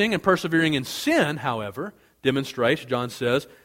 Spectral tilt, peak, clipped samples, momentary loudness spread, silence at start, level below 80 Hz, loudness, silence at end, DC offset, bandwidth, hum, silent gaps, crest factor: -5 dB/octave; -4 dBFS; under 0.1%; 9 LU; 0 s; -58 dBFS; -24 LUFS; 0.15 s; under 0.1%; 16.5 kHz; none; none; 20 dB